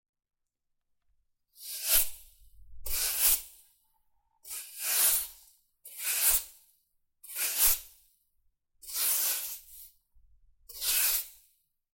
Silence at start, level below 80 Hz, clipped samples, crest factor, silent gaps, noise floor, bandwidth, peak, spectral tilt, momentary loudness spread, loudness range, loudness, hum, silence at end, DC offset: 1.6 s; -54 dBFS; under 0.1%; 24 dB; none; -81 dBFS; 17 kHz; -10 dBFS; 2.5 dB/octave; 21 LU; 2 LU; -27 LUFS; none; 0.65 s; under 0.1%